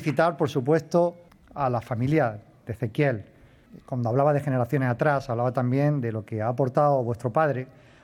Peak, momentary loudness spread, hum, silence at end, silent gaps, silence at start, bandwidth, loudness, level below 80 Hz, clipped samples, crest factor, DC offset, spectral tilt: -8 dBFS; 10 LU; none; 0.35 s; none; 0 s; 14 kHz; -25 LUFS; -60 dBFS; under 0.1%; 18 dB; under 0.1%; -8.5 dB/octave